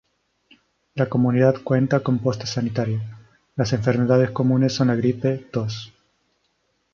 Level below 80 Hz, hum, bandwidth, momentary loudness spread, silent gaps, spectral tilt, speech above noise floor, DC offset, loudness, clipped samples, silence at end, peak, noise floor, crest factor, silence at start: -56 dBFS; none; 7.2 kHz; 12 LU; none; -7 dB/octave; 49 dB; under 0.1%; -21 LUFS; under 0.1%; 1.05 s; -4 dBFS; -69 dBFS; 18 dB; 0.95 s